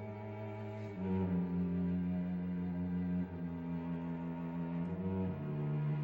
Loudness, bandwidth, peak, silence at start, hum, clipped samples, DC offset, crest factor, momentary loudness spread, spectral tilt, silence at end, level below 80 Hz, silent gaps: -39 LUFS; 4.2 kHz; -26 dBFS; 0 s; none; under 0.1%; under 0.1%; 12 dB; 8 LU; -11 dB/octave; 0 s; -62 dBFS; none